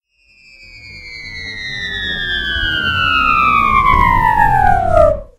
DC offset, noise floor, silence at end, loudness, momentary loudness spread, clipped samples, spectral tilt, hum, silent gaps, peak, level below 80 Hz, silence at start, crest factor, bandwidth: under 0.1%; -49 dBFS; 0.15 s; -13 LUFS; 16 LU; under 0.1%; -5 dB/octave; none; none; 0 dBFS; -26 dBFS; 0.6 s; 14 dB; 16 kHz